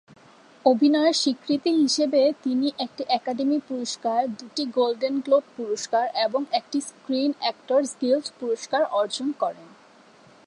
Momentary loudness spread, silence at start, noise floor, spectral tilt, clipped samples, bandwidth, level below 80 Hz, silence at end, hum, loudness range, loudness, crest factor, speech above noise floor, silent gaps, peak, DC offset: 9 LU; 0.65 s; -53 dBFS; -3 dB/octave; under 0.1%; 11 kHz; -78 dBFS; 0.8 s; none; 3 LU; -24 LUFS; 18 dB; 29 dB; none; -6 dBFS; under 0.1%